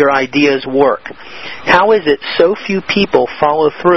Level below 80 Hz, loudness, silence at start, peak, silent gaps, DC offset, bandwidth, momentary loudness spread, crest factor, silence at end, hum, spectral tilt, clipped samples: -46 dBFS; -12 LUFS; 0 s; 0 dBFS; none; 1%; 6.2 kHz; 11 LU; 12 dB; 0 s; none; -5.5 dB/octave; 0.2%